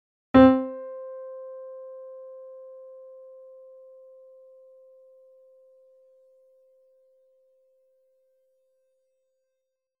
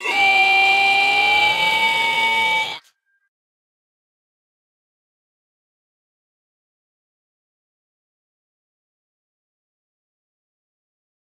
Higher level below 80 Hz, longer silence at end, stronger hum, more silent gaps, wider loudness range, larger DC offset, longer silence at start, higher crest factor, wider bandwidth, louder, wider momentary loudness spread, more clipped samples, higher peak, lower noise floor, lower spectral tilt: first, -54 dBFS vs -66 dBFS; second, 8.35 s vs 8.5 s; neither; neither; first, 29 LU vs 11 LU; neither; first, 0.35 s vs 0 s; first, 26 dB vs 18 dB; second, 4.6 kHz vs 16 kHz; second, -21 LUFS vs -15 LUFS; first, 31 LU vs 7 LU; neither; about the same, -2 dBFS vs -4 dBFS; first, -82 dBFS vs -60 dBFS; first, -9 dB/octave vs -0.5 dB/octave